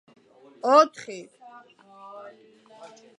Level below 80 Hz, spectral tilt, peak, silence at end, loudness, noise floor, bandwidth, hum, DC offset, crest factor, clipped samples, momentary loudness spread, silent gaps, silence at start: -88 dBFS; -3 dB/octave; -4 dBFS; 1.95 s; -20 LUFS; -53 dBFS; 10.5 kHz; none; under 0.1%; 24 dB; under 0.1%; 26 LU; none; 0.65 s